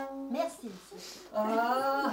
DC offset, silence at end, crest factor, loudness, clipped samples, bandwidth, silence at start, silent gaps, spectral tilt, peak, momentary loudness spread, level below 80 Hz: under 0.1%; 0 s; 16 dB; -32 LUFS; under 0.1%; 16 kHz; 0 s; none; -4 dB/octave; -16 dBFS; 16 LU; -72 dBFS